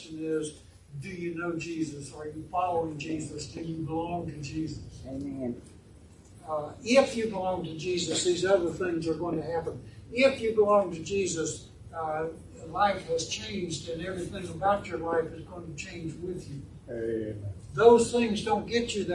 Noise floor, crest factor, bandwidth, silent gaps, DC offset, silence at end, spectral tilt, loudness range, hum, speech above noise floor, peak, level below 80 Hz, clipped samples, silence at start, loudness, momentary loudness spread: -53 dBFS; 24 dB; 11.5 kHz; none; under 0.1%; 0 s; -4.5 dB/octave; 7 LU; none; 23 dB; -6 dBFS; -56 dBFS; under 0.1%; 0 s; -29 LUFS; 16 LU